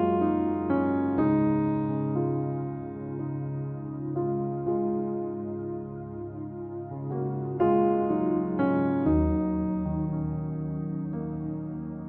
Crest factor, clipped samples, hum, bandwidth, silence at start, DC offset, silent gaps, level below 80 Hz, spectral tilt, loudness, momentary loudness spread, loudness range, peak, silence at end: 14 dB; under 0.1%; none; 4.1 kHz; 0 s; under 0.1%; none; -46 dBFS; -13 dB/octave; -29 LUFS; 12 LU; 6 LU; -12 dBFS; 0 s